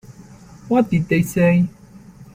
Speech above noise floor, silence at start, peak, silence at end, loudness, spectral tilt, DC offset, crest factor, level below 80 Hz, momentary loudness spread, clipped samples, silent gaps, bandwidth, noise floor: 26 dB; 0.1 s; -4 dBFS; 0.1 s; -18 LUFS; -7.5 dB/octave; under 0.1%; 14 dB; -48 dBFS; 4 LU; under 0.1%; none; 16 kHz; -43 dBFS